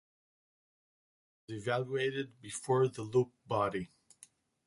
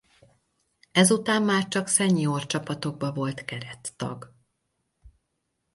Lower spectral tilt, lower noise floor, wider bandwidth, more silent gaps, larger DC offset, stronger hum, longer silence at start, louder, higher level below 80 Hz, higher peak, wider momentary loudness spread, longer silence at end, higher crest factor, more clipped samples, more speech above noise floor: first, -5.5 dB/octave vs -4 dB/octave; second, -63 dBFS vs -78 dBFS; about the same, 11.5 kHz vs 12 kHz; neither; neither; neither; first, 1.5 s vs 0.95 s; second, -34 LUFS vs -25 LUFS; second, -70 dBFS vs -64 dBFS; second, -18 dBFS vs -6 dBFS; second, 11 LU vs 15 LU; first, 0.8 s vs 0.65 s; about the same, 20 dB vs 22 dB; neither; second, 29 dB vs 53 dB